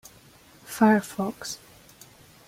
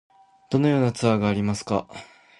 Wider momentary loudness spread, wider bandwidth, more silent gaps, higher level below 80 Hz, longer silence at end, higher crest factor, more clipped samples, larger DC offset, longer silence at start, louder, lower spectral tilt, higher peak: first, 18 LU vs 11 LU; first, 16 kHz vs 11.5 kHz; neither; second, -64 dBFS vs -54 dBFS; first, 0.95 s vs 0.35 s; about the same, 20 dB vs 18 dB; neither; neither; first, 0.7 s vs 0.5 s; about the same, -25 LUFS vs -23 LUFS; second, -5 dB/octave vs -6.5 dB/octave; about the same, -8 dBFS vs -6 dBFS